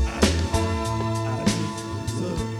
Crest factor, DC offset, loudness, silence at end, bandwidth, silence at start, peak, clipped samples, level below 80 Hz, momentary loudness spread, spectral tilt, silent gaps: 20 dB; under 0.1%; -25 LUFS; 0 s; 14.5 kHz; 0 s; -4 dBFS; under 0.1%; -32 dBFS; 8 LU; -5 dB/octave; none